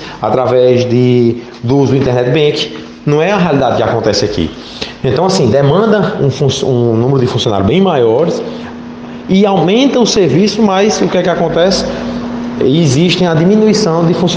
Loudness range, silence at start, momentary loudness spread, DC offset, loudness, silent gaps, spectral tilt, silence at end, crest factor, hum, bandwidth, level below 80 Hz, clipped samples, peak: 2 LU; 0 s; 10 LU; under 0.1%; -11 LUFS; none; -6 dB/octave; 0 s; 10 dB; none; 9.6 kHz; -40 dBFS; under 0.1%; 0 dBFS